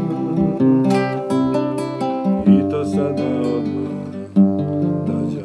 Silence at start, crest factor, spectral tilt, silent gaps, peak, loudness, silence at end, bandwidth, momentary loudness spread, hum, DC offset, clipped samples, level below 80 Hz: 0 s; 16 dB; -8.5 dB/octave; none; -2 dBFS; -19 LUFS; 0 s; 11 kHz; 8 LU; none; under 0.1%; under 0.1%; -50 dBFS